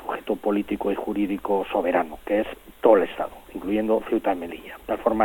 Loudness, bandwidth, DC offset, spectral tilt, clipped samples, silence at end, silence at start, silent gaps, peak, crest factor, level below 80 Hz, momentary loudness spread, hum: -24 LUFS; 17 kHz; under 0.1%; -7 dB/octave; under 0.1%; 0 s; 0 s; none; -4 dBFS; 20 dB; -52 dBFS; 13 LU; none